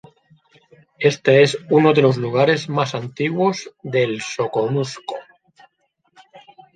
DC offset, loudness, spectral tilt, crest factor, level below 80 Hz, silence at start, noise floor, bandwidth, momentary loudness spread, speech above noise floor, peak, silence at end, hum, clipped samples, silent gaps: under 0.1%; -18 LUFS; -6 dB/octave; 18 dB; -64 dBFS; 1 s; -67 dBFS; 9.4 kHz; 12 LU; 49 dB; -2 dBFS; 0.4 s; none; under 0.1%; none